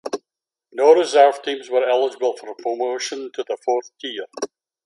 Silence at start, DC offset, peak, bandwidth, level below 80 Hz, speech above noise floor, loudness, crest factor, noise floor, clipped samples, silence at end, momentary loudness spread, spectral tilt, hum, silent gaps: 0.05 s; under 0.1%; 0 dBFS; 11.5 kHz; -80 dBFS; 68 dB; -20 LUFS; 20 dB; -87 dBFS; under 0.1%; 0.4 s; 16 LU; -2 dB/octave; none; none